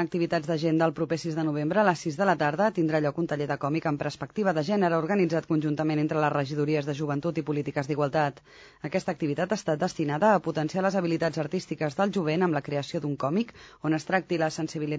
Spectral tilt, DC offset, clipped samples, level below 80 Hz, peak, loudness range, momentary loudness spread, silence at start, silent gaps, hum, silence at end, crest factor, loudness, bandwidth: -6.5 dB/octave; under 0.1%; under 0.1%; -64 dBFS; -10 dBFS; 2 LU; 6 LU; 0 s; none; none; 0 s; 18 dB; -27 LUFS; 8 kHz